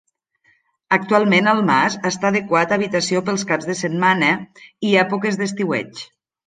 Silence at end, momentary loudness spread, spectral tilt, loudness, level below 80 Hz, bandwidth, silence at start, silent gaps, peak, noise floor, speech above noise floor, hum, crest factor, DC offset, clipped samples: 0.4 s; 9 LU; -4.5 dB/octave; -18 LUFS; -64 dBFS; 9.6 kHz; 0.9 s; none; -2 dBFS; -61 dBFS; 43 dB; none; 18 dB; under 0.1%; under 0.1%